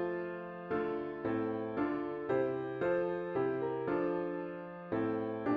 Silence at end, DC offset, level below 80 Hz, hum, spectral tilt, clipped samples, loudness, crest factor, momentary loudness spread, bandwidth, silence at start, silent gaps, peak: 0 s; under 0.1%; -70 dBFS; none; -6.5 dB/octave; under 0.1%; -36 LUFS; 14 dB; 6 LU; 5 kHz; 0 s; none; -20 dBFS